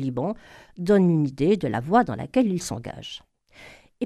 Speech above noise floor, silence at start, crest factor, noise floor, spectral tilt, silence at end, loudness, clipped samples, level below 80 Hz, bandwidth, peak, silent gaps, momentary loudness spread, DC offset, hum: 26 dB; 0 s; 18 dB; -49 dBFS; -6.5 dB/octave; 0 s; -23 LUFS; under 0.1%; -54 dBFS; 13.5 kHz; -6 dBFS; none; 17 LU; under 0.1%; none